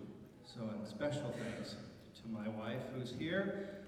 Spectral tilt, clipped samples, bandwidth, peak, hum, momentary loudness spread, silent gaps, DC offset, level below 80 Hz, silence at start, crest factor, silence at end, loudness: -6 dB/octave; under 0.1%; 15 kHz; -24 dBFS; none; 15 LU; none; under 0.1%; -70 dBFS; 0 s; 20 dB; 0 s; -43 LUFS